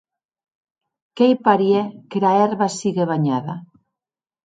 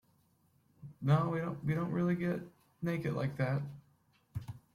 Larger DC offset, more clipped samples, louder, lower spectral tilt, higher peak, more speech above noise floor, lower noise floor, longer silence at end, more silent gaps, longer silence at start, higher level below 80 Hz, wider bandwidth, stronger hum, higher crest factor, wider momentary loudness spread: neither; neither; first, -19 LUFS vs -35 LUFS; second, -6.5 dB/octave vs -9 dB/octave; first, 0 dBFS vs -18 dBFS; first, over 72 dB vs 38 dB; first, under -90 dBFS vs -71 dBFS; first, 0.8 s vs 0.15 s; neither; first, 1.15 s vs 0.8 s; about the same, -70 dBFS vs -66 dBFS; second, 9.4 kHz vs 13 kHz; neither; about the same, 20 dB vs 18 dB; second, 10 LU vs 16 LU